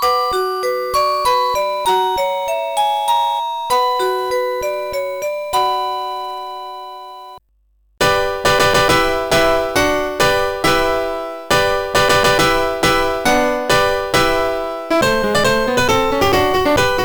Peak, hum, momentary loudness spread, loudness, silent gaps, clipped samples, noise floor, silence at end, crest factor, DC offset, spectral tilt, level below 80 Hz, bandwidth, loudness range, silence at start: -8 dBFS; none; 9 LU; -16 LUFS; none; under 0.1%; -58 dBFS; 0 s; 10 dB; under 0.1%; -3.5 dB/octave; -36 dBFS; 19.5 kHz; 6 LU; 0 s